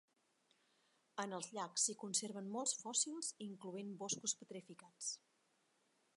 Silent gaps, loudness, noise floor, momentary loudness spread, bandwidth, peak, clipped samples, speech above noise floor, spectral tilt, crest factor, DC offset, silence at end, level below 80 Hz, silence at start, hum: none; -42 LUFS; -80 dBFS; 14 LU; 11.5 kHz; -22 dBFS; under 0.1%; 35 dB; -2 dB/octave; 24 dB; under 0.1%; 1 s; under -90 dBFS; 1.15 s; none